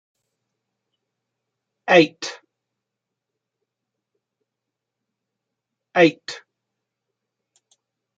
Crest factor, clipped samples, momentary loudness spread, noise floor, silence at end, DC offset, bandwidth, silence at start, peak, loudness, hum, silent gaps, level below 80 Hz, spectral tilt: 26 dB; under 0.1%; 20 LU; -84 dBFS; 1.8 s; under 0.1%; 7.8 kHz; 1.85 s; -2 dBFS; -17 LUFS; none; none; -74 dBFS; -5 dB/octave